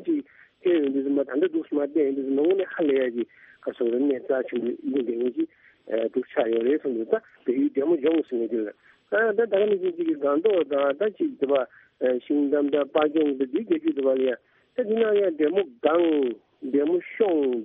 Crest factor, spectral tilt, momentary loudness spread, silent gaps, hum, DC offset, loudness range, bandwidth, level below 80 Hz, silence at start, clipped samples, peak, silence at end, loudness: 18 dB; -4 dB/octave; 7 LU; none; none; under 0.1%; 3 LU; 3.8 kHz; -74 dBFS; 0 s; under 0.1%; -6 dBFS; 0 s; -25 LUFS